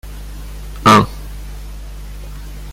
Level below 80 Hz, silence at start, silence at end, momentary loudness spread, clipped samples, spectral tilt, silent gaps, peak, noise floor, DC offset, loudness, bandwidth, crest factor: -30 dBFS; 0.05 s; 0 s; 23 LU; under 0.1%; -5 dB/octave; none; 0 dBFS; -29 dBFS; under 0.1%; -12 LUFS; 16.5 kHz; 18 dB